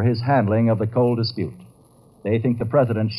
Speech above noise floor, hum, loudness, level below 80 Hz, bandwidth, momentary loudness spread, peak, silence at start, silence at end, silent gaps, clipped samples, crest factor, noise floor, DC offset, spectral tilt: 33 dB; none; -21 LUFS; -56 dBFS; 10.5 kHz; 10 LU; -6 dBFS; 0 s; 0 s; none; under 0.1%; 14 dB; -52 dBFS; under 0.1%; -9.5 dB/octave